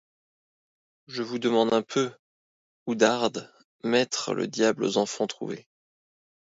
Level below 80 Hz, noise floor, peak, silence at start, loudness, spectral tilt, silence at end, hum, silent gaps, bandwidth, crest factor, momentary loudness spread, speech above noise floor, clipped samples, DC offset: -74 dBFS; under -90 dBFS; -6 dBFS; 1.1 s; -26 LUFS; -4 dB/octave; 0.95 s; none; 2.19-2.86 s, 3.64-3.79 s; 8 kHz; 24 dB; 14 LU; over 64 dB; under 0.1%; under 0.1%